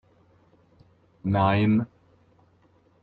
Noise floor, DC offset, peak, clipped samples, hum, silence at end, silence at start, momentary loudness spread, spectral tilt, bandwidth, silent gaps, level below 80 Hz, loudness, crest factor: -61 dBFS; under 0.1%; -8 dBFS; under 0.1%; none; 1.15 s; 1.25 s; 14 LU; -10.5 dB/octave; 4.6 kHz; none; -58 dBFS; -24 LUFS; 20 dB